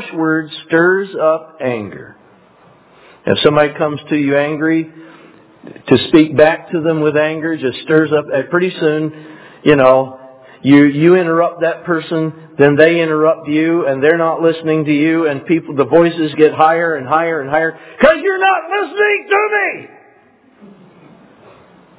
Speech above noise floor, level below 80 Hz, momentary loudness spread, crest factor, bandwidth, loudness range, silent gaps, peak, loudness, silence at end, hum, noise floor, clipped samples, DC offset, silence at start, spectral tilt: 36 dB; -54 dBFS; 10 LU; 14 dB; 4 kHz; 4 LU; none; 0 dBFS; -13 LUFS; 2.15 s; none; -49 dBFS; 0.2%; under 0.1%; 0 s; -10 dB/octave